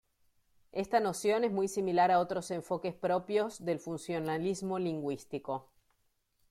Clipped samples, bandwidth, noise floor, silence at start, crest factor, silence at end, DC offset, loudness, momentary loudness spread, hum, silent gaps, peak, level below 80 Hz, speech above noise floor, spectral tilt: under 0.1%; 14.5 kHz; -76 dBFS; 0.75 s; 18 dB; 0.9 s; under 0.1%; -33 LUFS; 11 LU; none; none; -16 dBFS; -70 dBFS; 44 dB; -5.5 dB/octave